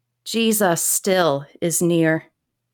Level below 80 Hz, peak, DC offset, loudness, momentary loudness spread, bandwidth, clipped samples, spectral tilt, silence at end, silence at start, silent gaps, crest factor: -66 dBFS; -6 dBFS; under 0.1%; -19 LUFS; 7 LU; 19 kHz; under 0.1%; -3.5 dB/octave; 0.5 s; 0.25 s; none; 16 dB